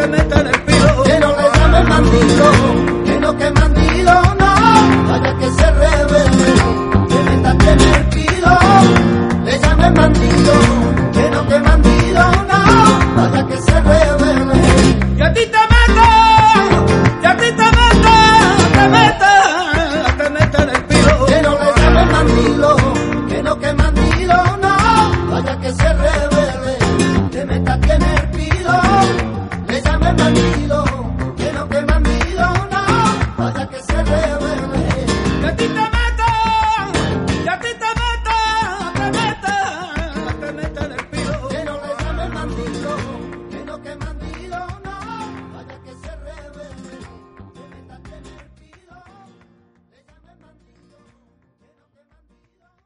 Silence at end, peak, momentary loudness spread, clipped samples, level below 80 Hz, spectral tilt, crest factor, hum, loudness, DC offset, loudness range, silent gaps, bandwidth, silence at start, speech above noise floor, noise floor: 4.75 s; 0 dBFS; 15 LU; under 0.1%; -20 dBFS; -5.5 dB/octave; 12 dB; none; -12 LUFS; under 0.1%; 14 LU; none; 11 kHz; 0 s; 51 dB; -61 dBFS